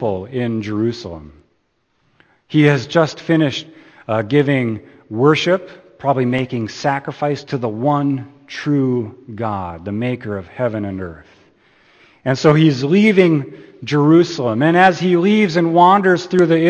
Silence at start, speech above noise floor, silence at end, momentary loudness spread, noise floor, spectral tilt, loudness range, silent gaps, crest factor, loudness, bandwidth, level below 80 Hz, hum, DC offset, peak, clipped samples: 0 s; 49 dB; 0 s; 14 LU; -64 dBFS; -7 dB/octave; 8 LU; none; 16 dB; -16 LUFS; 8.6 kHz; -54 dBFS; none; under 0.1%; 0 dBFS; under 0.1%